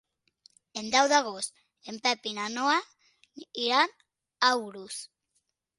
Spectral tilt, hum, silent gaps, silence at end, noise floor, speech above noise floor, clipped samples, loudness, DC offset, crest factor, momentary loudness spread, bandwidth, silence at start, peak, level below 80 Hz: -1 dB/octave; none; none; 0.7 s; -78 dBFS; 49 dB; under 0.1%; -27 LUFS; under 0.1%; 24 dB; 17 LU; 11.5 kHz; 0.75 s; -6 dBFS; -78 dBFS